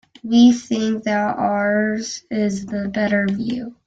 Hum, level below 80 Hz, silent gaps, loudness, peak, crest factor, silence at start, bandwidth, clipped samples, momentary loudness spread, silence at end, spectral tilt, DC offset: none; -56 dBFS; none; -19 LUFS; -2 dBFS; 16 dB; 0.25 s; 7.8 kHz; under 0.1%; 11 LU; 0.15 s; -5.5 dB/octave; under 0.1%